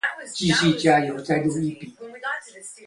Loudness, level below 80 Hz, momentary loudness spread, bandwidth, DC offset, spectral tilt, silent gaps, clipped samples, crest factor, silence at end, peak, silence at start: -22 LUFS; -56 dBFS; 18 LU; 11.5 kHz; under 0.1%; -4.5 dB/octave; none; under 0.1%; 18 dB; 0 s; -4 dBFS; 0.05 s